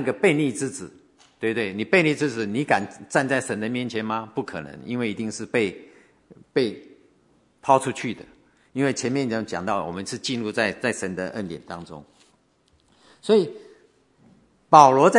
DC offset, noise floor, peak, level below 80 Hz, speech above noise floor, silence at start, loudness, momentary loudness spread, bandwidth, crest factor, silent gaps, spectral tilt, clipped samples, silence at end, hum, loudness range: under 0.1%; -63 dBFS; 0 dBFS; -68 dBFS; 41 dB; 0 s; -23 LUFS; 16 LU; 11 kHz; 24 dB; none; -5 dB/octave; under 0.1%; 0 s; none; 5 LU